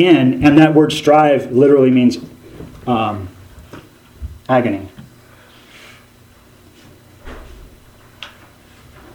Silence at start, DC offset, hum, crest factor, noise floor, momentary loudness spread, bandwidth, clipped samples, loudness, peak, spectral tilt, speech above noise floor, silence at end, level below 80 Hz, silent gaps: 0 s; under 0.1%; none; 16 dB; -46 dBFS; 26 LU; 15 kHz; under 0.1%; -13 LUFS; 0 dBFS; -7 dB/octave; 34 dB; 0.9 s; -42 dBFS; none